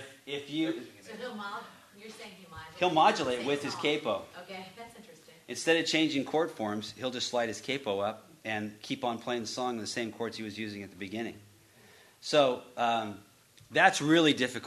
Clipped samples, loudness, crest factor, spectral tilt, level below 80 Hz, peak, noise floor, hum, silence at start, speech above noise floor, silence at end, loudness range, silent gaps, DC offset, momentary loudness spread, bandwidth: under 0.1%; -31 LUFS; 24 dB; -3.5 dB/octave; -74 dBFS; -8 dBFS; -59 dBFS; none; 0 s; 27 dB; 0 s; 6 LU; none; under 0.1%; 21 LU; 13.5 kHz